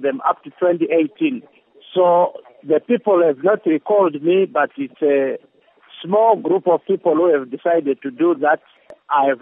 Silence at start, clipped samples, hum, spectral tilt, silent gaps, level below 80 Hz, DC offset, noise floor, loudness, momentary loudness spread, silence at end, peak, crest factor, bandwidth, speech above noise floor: 0 s; under 0.1%; none; -10 dB/octave; none; -80 dBFS; under 0.1%; -48 dBFS; -18 LUFS; 7 LU; 0.05 s; -2 dBFS; 16 dB; 3.8 kHz; 31 dB